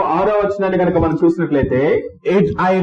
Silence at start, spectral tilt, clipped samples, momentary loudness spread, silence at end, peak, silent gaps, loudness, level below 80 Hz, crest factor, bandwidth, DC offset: 0 s; -9 dB/octave; under 0.1%; 3 LU; 0 s; -4 dBFS; none; -16 LUFS; -38 dBFS; 12 dB; 7.6 kHz; under 0.1%